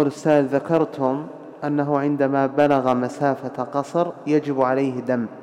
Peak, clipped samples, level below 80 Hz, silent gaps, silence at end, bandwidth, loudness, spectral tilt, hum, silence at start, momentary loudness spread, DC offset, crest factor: -6 dBFS; under 0.1%; -66 dBFS; none; 0 s; 10.5 kHz; -21 LUFS; -7.5 dB/octave; none; 0 s; 8 LU; under 0.1%; 14 dB